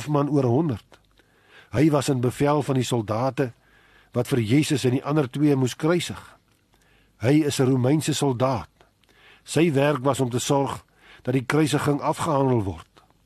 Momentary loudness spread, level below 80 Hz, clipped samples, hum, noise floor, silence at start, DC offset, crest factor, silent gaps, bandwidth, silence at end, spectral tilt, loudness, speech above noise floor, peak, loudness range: 9 LU; -56 dBFS; under 0.1%; none; -62 dBFS; 0 s; under 0.1%; 16 dB; none; 13 kHz; 0.4 s; -6 dB/octave; -23 LUFS; 40 dB; -6 dBFS; 2 LU